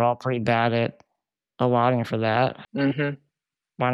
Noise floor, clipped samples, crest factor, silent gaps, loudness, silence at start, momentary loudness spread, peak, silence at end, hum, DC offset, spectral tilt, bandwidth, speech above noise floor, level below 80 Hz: -86 dBFS; under 0.1%; 18 dB; none; -24 LUFS; 0 s; 7 LU; -8 dBFS; 0 s; none; under 0.1%; -8 dB/octave; 7.8 kHz; 63 dB; -66 dBFS